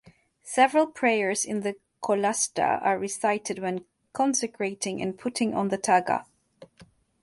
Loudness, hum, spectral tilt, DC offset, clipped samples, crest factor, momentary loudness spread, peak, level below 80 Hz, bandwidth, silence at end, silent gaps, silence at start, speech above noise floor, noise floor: -26 LUFS; none; -3.5 dB/octave; under 0.1%; under 0.1%; 20 dB; 8 LU; -8 dBFS; -68 dBFS; 12 kHz; 0.4 s; none; 0.45 s; 31 dB; -57 dBFS